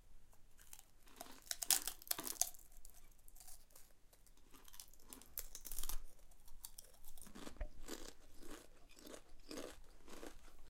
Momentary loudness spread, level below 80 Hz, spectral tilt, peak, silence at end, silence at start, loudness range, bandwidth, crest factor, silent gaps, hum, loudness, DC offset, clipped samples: 25 LU; -56 dBFS; -0.5 dB/octave; -10 dBFS; 0 s; 0 s; 14 LU; 17 kHz; 38 dB; none; none; -44 LUFS; under 0.1%; under 0.1%